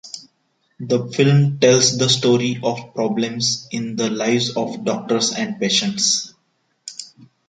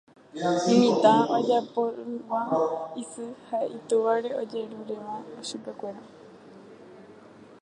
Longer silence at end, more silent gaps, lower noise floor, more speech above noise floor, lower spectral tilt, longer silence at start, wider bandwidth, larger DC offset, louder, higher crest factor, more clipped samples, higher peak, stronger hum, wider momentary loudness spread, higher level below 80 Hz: first, 0.25 s vs 0.05 s; neither; first, -67 dBFS vs -50 dBFS; first, 48 dB vs 24 dB; second, -4 dB/octave vs -5.5 dB/octave; second, 0.05 s vs 0.35 s; about the same, 9.4 kHz vs 10 kHz; neither; first, -18 LUFS vs -26 LUFS; about the same, 18 dB vs 22 dB; neither; first, -2 dBFS vs -6 dBFS; neither; about the same, 19 LU vs 18 LU; first, -62 dBFS vs -78 dBFS